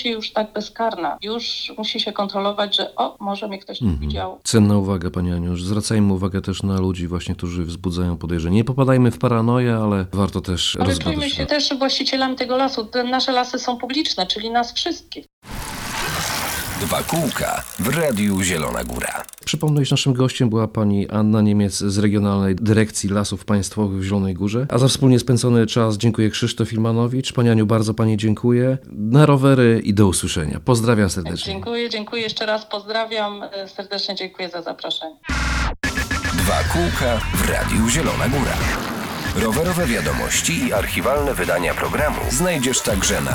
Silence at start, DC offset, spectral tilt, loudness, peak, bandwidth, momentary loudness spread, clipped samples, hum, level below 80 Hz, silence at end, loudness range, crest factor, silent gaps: 0 s; under 0.1%; -5 dB/octave; -20 LUFS; 0 dBFS; 20 kHz; 9 LU; under 0.1%; none; -34 dBFS; 0 s; 6 LU; 20 dB; 15.33-15.42 s